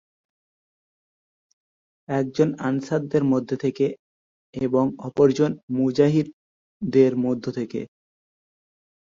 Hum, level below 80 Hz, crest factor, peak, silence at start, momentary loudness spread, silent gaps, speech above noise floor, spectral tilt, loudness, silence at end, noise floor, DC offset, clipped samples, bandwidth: none; -62 dBFS; 20 dB; -4 dBFS; 2.1 s; 13 LU; 3.99-4.53 s, 5.63-5.68 s, 6.33-6.80 s; over 68 dB; -8 dB/octave; -23 LUFS; 1.3 s; under -90 dBFS; under 0.1%; under 0.1%; 7.6 kHz